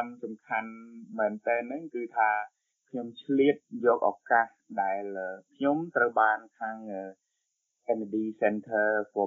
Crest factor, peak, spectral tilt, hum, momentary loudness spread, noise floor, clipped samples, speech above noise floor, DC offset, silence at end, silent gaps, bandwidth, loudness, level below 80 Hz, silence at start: 20 dB; -10 dBFS; -4 dB/octave; none; 14 LU; -81 dBFS; under 0.1%; 52 dB; under 0.1%; 0 s; none; 7.2 kHz; -29 LUFS; -82 dBFS; 0 s